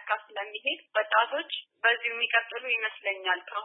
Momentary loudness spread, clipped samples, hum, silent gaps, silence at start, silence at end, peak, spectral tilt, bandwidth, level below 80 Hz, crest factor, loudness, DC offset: 7 LU; under 0.1%; none; none; 0 s; 0 s; -10 dBFS; -2.5 dB/octave; 4.1 kHz; under -90 dBFS; 20 dB; -28 LUFS; under 0.1%